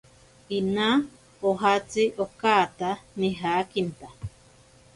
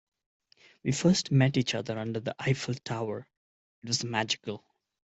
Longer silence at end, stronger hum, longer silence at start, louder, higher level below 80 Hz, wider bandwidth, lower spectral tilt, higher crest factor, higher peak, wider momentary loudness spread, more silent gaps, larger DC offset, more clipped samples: about the same, 0.65 s vs 0.6 s; neither; second, 0.5 s vs 0.85 s; first, -25 LUFS vs -29 LUFS; first, -56 dBFS vs -66 dBFS; first, 11.5 kHz vs 8.2 kHz; about the same, -5 dB/octave vs -5 dB/octave; about the same, 20 dB vs 18 dB; first, -8 dBFS vs -12 dBFS; first, 17 LU vs 13 LU; second, none vs 3.37-3.82 s; neither; neither